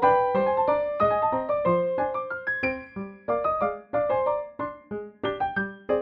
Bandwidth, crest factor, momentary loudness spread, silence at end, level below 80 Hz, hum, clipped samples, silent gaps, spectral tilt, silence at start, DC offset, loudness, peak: 5.2 kHz; 16 dB; 12 LU; 0 s; -56 dBFS; none; under 0.1%; none; -8.5 dB/octave; 0 s; under 0.1%; -26 LUFS; -10 dBFS